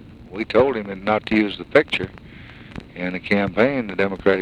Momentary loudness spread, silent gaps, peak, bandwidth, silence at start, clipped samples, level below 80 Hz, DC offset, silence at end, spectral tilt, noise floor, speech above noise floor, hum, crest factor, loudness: 19 LU; none; 0 dBFS; 10 kHz; 0 s; under 0.1%; -48 dBFS; under 0.1%; 0 s; -7 dB/octave; -41 dBFS; 20 dB; none; 20 dB; -21 LUFS